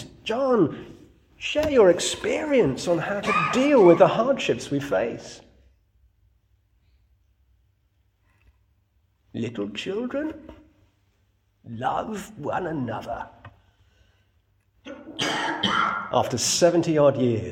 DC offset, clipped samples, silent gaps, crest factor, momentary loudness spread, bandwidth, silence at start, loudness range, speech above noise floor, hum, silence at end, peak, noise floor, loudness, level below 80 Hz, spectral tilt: under 0.1%; under 0.1%; none; 22 dB; 17 LU; 16.5 kHz; 0 s; 14 LU; 44 dB; none; 0 s; -2 dBFS; -67 dBFS; -23 LUFS; -56 dBFS; -4.5 dB/octave